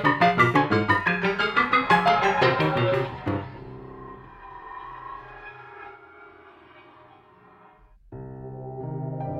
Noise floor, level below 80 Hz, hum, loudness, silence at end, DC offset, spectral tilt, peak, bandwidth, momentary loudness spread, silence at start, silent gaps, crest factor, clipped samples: -53 dBFS; -54 dBFS; none; -22 LUFS; 0 s; under 0.1%; -6.5 dB/octave; -6 dBFS; 16 kHz; 23 LU; 0 s; none; 20 dB; under 0.1%